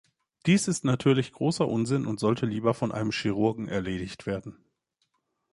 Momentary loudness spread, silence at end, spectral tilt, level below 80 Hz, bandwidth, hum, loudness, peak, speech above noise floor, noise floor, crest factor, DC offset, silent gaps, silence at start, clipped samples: 10 LU; 1 s; -6 dB/octave; -58 dBFS; 11.5 kHz; none; -27 LUFS; -10 dBFS; 50 dB; -76 dBFS; 18 dB; under 0.1%; none; 0.45 s; under 0.1%